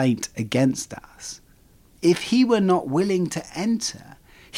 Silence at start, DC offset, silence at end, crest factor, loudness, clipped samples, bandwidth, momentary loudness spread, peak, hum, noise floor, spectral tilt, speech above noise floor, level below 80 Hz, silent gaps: 0 s; under 0.1%; 0 s; 16 dB; -22 LUFS; under 0.1%; 15.5 kHz; 17 LU; -8 dBFS; none; -54 dBFS; -5 dB/octave; 32 dB; -56 dBFS; none